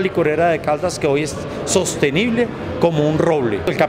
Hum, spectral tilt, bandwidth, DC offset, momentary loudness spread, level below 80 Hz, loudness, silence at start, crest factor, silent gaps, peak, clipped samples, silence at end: none; -5 dB/octave; 16 kHz; under 0.1%; 4 LU; -44 dBFS; -18 LUFS; 0 s; 16 dB; none; -2 dBFS; under 0.1%; 0 s